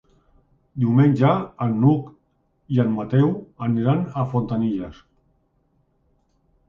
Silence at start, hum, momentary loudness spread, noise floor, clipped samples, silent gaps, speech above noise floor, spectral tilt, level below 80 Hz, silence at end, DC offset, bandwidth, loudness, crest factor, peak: 0.75 s; none; 10 LU; -66 dBFS; under 0.1%; none; 46 dB; -10.5 dB/octave; -54 dBFS; 1.75 s; under 0.1%; 5.2 kHz; -21 LUFS; 18 dB; -4 dBFS